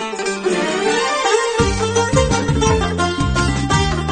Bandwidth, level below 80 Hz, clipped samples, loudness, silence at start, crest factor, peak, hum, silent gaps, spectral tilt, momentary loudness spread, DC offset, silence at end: 9.6 kHz; -28 dBFS; under 0.1%; -17 LUFS; 0 s; 16 dB; -2 dBFS; none; none; -4.5 dB/octave; 3 LU; under 0.1%; 0 s